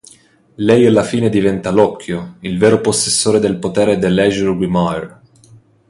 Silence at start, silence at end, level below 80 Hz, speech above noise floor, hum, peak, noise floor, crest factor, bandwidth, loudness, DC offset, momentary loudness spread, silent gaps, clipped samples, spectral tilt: 0.6 s; 0.8 s; -44 dBFS; 33 dB; none; 0 dBFS; -47 dBFS; 14 dB; 11.5 kHz; -14 LUFS; under 0.1%; 12 LU; none; under 0.1%; -5 dB/octave